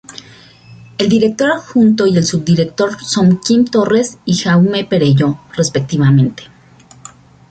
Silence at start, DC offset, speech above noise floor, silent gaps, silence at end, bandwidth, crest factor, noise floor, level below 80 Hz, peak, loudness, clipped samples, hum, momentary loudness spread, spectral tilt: 0.15 s; under 0.1%; 31 dB; none; 1.05 s; 9.2 kHz; 12 dB; -43 dBFS; -48 dBFS; -2 dBFS; -13 LUFS; under 0.1%; none; 7 LU; -6 dB/octave